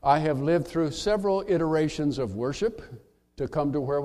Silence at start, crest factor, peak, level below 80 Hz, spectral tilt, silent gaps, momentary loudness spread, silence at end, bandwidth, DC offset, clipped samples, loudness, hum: 0.05 s; 18 dB; -8 dBFS; -50 dBFS; -6.5 dB/octave; none; 7 LU; 0 s; 13 kHz; under 0.1%; under 0.1%; -27 LUFS; none